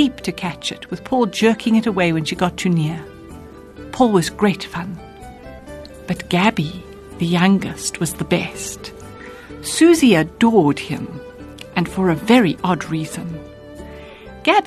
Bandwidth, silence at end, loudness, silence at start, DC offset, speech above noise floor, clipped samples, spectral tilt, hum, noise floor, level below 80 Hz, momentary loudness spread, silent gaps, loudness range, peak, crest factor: 13 kHz; 0 s; -18 LUFS; 0 s; under 0.1%; 20 dB; under 0.1%; -5 dB/octave; none; -38 dBFS; -46 dBFS; 23 LU; none; 5 LU; -2 dBFS; 18 dB